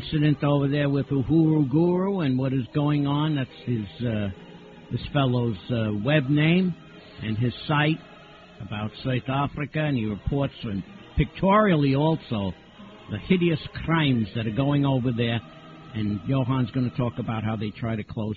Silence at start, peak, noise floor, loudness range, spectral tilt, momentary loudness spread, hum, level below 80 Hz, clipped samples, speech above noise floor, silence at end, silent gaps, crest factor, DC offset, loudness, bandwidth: 0 s; -6 dBFS; -47 dBFS; 4 LU; -9.5 dB/octave; 13 LU; none; -46 dBFS; under 0.1%; 24 dB; 0 s; none; 18 dB; under 0.1%; -25 LUFS; 4.7 kHz